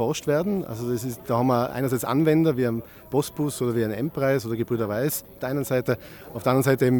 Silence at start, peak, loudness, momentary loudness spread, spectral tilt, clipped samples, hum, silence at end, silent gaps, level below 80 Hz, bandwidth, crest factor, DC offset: 0 s; -8 dBFS; -25 LUFS; 8 LU; -6.5 dB/octave; under 0.1%; none; 0 s; none; -56 dBFS; 19 kHz; 16 dB; under 0.1%